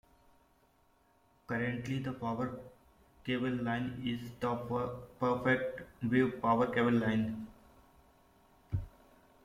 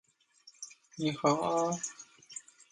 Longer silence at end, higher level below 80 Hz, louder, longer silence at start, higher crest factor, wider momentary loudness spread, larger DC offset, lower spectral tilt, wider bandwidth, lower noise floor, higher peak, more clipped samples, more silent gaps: first, 0.55 s vs 0.3 s; first, -60 dBFS vs -76 dBFS; about the same, -34 LUFS vs -32 LUFS; first, 1.5 s vs 0.45 s; about the same, 20 dB vs 22 dB; second, 11 LU vs 18 LU; neither; first, -7.5 dB/octave vs -4.5 dB/octave; first, 14.5 kHz vs 11.5 kHz; first, -69 dBFS vs -62 dBFS; about the same, -16 dBFS vs -14 dBFS; neither; neither